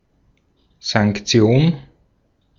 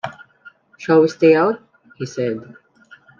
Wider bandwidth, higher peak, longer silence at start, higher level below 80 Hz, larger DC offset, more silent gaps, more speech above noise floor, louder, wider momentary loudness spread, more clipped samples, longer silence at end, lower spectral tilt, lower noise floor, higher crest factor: about the same, 7.6 kHz vs 7.2 kHz; about the same, -2 dBFS vs -2 dBFS; first, 0.85 s vs 0.05 s; first, -48 dBFS vs -68 dBFS; neither; neither; first, 46 dB vs 32 dB; about the same, -17 LUFS vs -17 LUFS; second, 13 LU vs 18 LU; neither; about the same, 0.8 s vs 0.75 s; second, -5.5 dB/octave vs -7 dB/octave; first, -62 dBFS vs -48 dBFS; about the same, 18 dB vs 16 dB